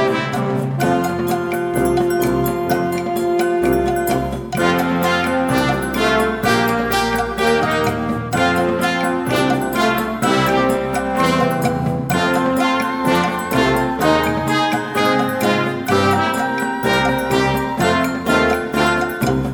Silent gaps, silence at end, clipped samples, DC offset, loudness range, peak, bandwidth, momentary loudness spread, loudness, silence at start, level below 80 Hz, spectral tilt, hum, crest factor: none; 0 s; under 0.1%; under 0.1%; 1 LU; 0 dBFS; 17.5 kHz; 4 LU; -17 LUFS; 0 s; -38 dBFS; -5 dB/octave; none; 16 dB